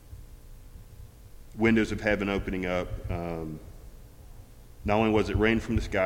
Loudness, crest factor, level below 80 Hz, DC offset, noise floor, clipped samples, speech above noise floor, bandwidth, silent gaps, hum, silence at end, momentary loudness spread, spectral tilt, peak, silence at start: -28 LUFS; 22 dB; -40 dBFS; under 0.1%; -48 dBFS; under 0.1%; 21 dB; 16.5 kHz; none; none; 0 s; 23 LU; -6.5 dB/octave; -8 dBFS; 0.05 s